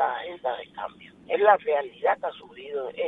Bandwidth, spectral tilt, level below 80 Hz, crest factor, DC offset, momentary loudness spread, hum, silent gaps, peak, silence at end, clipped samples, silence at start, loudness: 4 kHz; -5.5 dB/octave; -72 dBFS; 20 dB; under 0.1%; 17 LU; none; none; -6 dBFS; 0 s; under 0.1%; 0 s; -26 LUFS